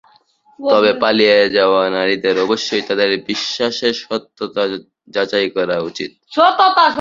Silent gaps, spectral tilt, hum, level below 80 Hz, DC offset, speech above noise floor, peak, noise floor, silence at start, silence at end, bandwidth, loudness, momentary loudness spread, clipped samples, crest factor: none; -3.5 dB/octave; none; -60 dBFS; under 0.1%; 37 dB; 0 dBFS; -53 dBFS; 0.6 s; 0 s; 7.6 kHz; -15 LUFS; 12 LU; under 0.1%; 16 dB